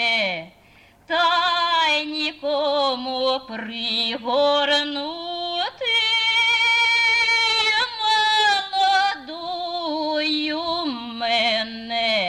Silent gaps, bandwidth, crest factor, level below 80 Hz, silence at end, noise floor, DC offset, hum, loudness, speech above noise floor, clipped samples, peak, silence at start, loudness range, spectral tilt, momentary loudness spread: none; 12 kHz; 14 dB; -62 dBFS; 0 s; -52 dBFS; under 0.1%; none; -20 LUFS; 29 dB; under 0.1%; -8 dBFS; 0 s; 5 LU; -1.5 dB/octave; 11 LU